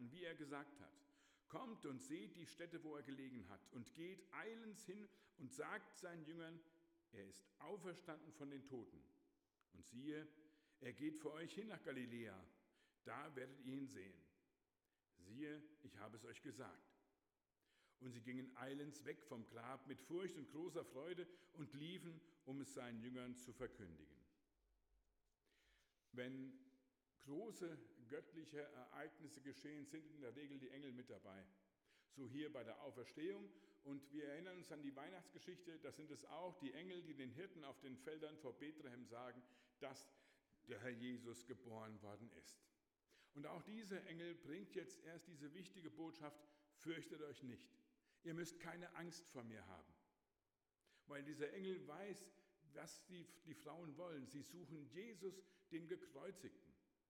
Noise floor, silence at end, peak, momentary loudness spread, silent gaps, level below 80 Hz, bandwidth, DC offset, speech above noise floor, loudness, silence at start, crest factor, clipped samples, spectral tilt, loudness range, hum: under -90 dBFS; 0.3 s; -36 dBFS; 9 LU; none; under -90 dBFS; 17 kHz; under 0.1%; over 35 dB; -56 LUFS; 0 s; 20 dB; under 0.1%; -5 dB/octave; 4 LU; none